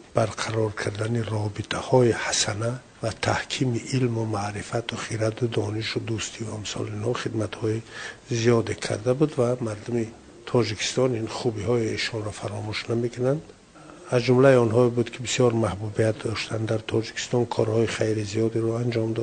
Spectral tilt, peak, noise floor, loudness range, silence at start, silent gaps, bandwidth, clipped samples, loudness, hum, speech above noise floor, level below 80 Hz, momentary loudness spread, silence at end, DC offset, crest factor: -5.5 dB/octave; -4 dBFS; -46 dBFS; 5 LU; 0 s; none; 9.6 kHz; under 0.1%; -25 LUFS; none; 22 dB; -56 dBFS; 9 LU; 0 s; under 0.1%; 22 dB